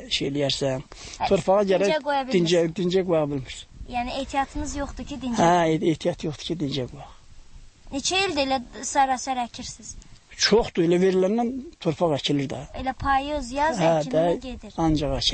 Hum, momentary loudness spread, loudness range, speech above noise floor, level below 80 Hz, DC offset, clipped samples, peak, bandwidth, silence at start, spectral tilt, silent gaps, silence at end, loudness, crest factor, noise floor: none; 12 LU; 3 LU; 21 dB; -42 dBFS; under 0.1%; under 0.1%; -8 dBFS; 8.8 kHz; 0 s; -4.5 dB/octave; none; 0 s; -24 LUFS; 16 dB; -45 dBFS